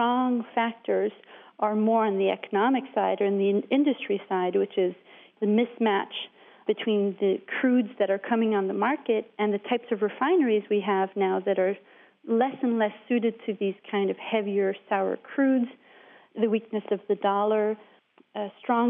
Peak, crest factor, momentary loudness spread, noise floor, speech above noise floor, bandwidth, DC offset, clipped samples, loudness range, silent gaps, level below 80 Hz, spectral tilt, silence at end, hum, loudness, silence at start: -12 dBFS; 14 dB; 6 LU; -54 dBFS; 28 dB; 3.8 kHz; under 0.1%; under 0.1%; 2 LU; none; -84 dBFS; -4.5 dB/octave; 0 s; none; -26 LUFS; 0 s